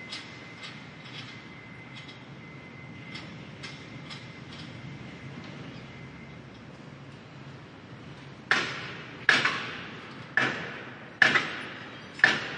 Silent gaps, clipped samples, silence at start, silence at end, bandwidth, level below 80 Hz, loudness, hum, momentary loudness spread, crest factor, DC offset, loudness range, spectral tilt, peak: none; under 0.1%; 0 s; 0 s; 11 kHz; -68 dBFS; -28 LUFS; none; 22 LU; 30 dB; under 0.1%; 17 LU; -3.5 dB/octave; -4 dBFS